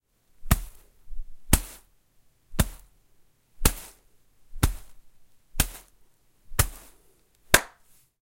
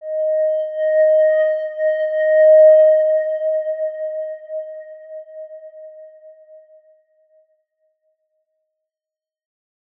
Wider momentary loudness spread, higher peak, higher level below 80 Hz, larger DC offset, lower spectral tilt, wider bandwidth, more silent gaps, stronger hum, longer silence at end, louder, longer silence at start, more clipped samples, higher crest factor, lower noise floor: about the same, 26 LU vs 26 LU; first, 0 dBFS vs -4 dBFS; first, -34 dBFS vs under -90 dBFS; neither; about the same, -3 dB/octave vs -2 dB/octave; first, 16.5 kHz vs 3.3 kHz; neither; neither; second, 0.55 s vs 3.7 s; second, -27 LUFS vs -15 LUFS; first, 0.4 s vs 0 s; neither; first, 30 dB vs 14 dB; second, -61 dBFS vs -90 dBFS